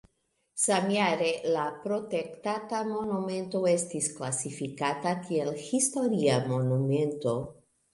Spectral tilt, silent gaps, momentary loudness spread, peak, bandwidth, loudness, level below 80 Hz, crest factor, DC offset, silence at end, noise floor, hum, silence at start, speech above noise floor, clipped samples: -4.5 dB/octave; none; 7 LU; -12 dBFS; 11.5 kHz; -29 LUFS; -68 dBFS; 18 dB; under 0.1%; 0.4 s; -75 dBFS; none; 0.55 s; 47 dB; under 0.1%